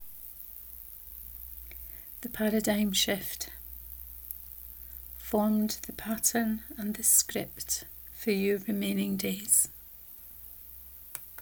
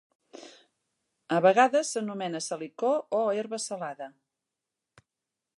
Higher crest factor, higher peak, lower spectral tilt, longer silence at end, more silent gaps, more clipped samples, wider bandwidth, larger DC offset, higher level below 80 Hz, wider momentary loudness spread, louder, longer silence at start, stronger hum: about the same, 22 dB vs 20 dB; about the same, -10 dBFS vs -10 dBFS; about the same, -3 dB/octave vs -4 dB/octave; second, 0 s vs 1.5 s; neither; neither; first, over 20 kHz vs 11.5 kHz; neither; first, -54 dBFS vs -84 dBFS; second, 19 LU vs 22 LU; about the same, -29 LUFS vs -27 LUFS; second, 0 s vs 0.35 s; neither